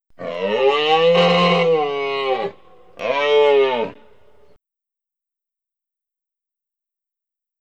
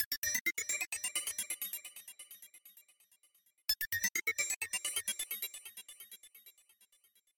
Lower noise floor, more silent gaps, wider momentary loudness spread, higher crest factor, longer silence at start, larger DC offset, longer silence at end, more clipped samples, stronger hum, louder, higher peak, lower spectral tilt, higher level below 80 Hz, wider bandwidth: first, -87 dBFS vs -72 dBFS; second, none vs 0.05-0.11 s, 0.17-0.22 s, 0.41-0.45 s, 4.56-4.61 s; second, 13 LU vs 19 LU; second, 16 dB vs 24 dB; first, 0.2 s vs 0 s; neither; first, 3.65 s vs 0.85 s; neither; neither; first, -17 LUFS vs -35 LUFS; first, -4 dBFS vs -16 dBFS; first, -5.5 dB/octave vs 1.5 dB/octave; first, -64 dBFS vs -72 dBFS; second, 8.2 kHz vs 17 kHz